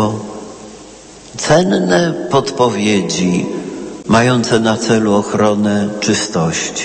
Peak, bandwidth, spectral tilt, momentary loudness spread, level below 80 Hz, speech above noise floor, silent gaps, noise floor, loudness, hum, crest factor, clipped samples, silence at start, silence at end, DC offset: 0 dBFS; 8.8 kHz; -4.5 dB/octave; 14 LU; -46 dBFS; 23 dB; none; -36 dBFS; -14 LUFS; none; 14 dB; under 0.1%; 0 s; 0 s; under 0.1%